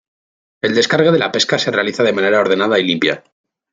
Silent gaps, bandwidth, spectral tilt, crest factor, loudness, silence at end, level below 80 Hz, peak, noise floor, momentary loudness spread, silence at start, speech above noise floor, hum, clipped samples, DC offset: none; 9.2 kHz; -4 dB/octave; 14 dB; -15 LUFS; 0.55 s; -60 dBFS; -2 dBFS; under -90 dBFS; 5 LU; 0.65 s; over 75 dB; none; under 0.1%; under 0.1%